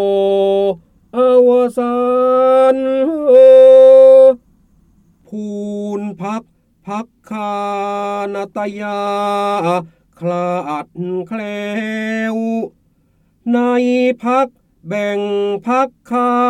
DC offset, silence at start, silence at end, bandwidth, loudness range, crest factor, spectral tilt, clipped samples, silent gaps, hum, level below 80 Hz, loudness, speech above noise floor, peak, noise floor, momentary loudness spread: under 0.1%; 0 s; 0 s; 9.4 kHz; 14 LU; 12 dB; -6.5 dB/octave; under 0.1%; none; none; -58 dBFS; -13 LUFS; 43 dB; 0 dBFS; -57 dBFS; 18 LU